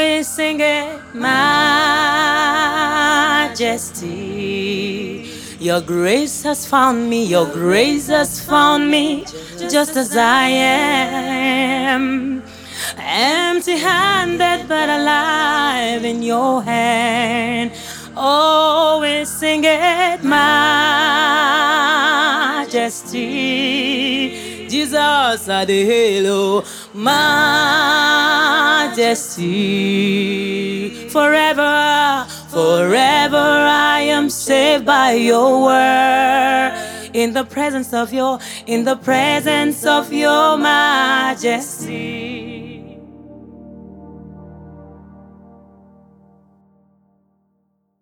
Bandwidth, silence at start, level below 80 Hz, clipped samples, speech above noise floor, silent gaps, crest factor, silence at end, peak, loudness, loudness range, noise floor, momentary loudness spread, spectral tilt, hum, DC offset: 20 kHz; 0 s; -52 dBFS; under 0.1%; 51 dB; none; 16 dB; 3.1 s; 0 dBFS; -15 LUFS; 4 LU; -66 dBFS; 11 LU; -3 dB/octave; none; under 0.1%